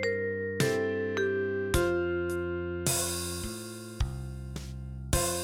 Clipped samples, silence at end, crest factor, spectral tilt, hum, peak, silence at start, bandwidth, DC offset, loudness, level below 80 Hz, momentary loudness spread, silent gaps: under 0.1%; 0 s; 20 dB; -4 dB/octave; none; -10 dBFS; 0 s; 17 kHz; under 0.1%; -31 LUFS; -42 dBFS; 12 LU; none